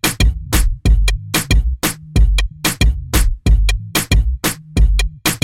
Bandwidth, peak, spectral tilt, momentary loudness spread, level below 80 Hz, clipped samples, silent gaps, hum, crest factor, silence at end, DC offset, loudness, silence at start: 17 kHz; -2 dBFS; -4 dB/octave; 3 LU; -16 dBFS; under 0.1%; none; none; 12 dB; 0.05 s; under 0.1%; -17 LUFS; 0.05 s